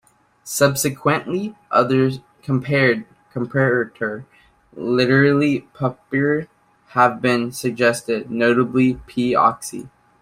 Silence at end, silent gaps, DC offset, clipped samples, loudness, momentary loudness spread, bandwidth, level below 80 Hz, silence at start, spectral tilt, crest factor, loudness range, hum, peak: 0.35 s; none; under 0.1%; under 0.1%; -19 LUFS; 11 LU; 16 kHz; -54 dBFS; 0.45 s; -5.5 dB/octave; 18 dB; 2 LU; none; -2 dBFS